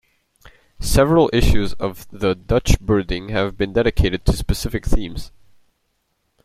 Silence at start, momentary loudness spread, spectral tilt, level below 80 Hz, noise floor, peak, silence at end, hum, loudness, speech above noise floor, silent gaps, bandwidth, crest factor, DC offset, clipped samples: 0.8 s; 11 LU; -5.5 dB/octave; -26 dBFS; -69 dBFS; -2 dBFS; 1.15 s; none; -20 LUFS; 52 dB; none; 15.5 kHz; 18 dB; under 0.1%; under 0.1%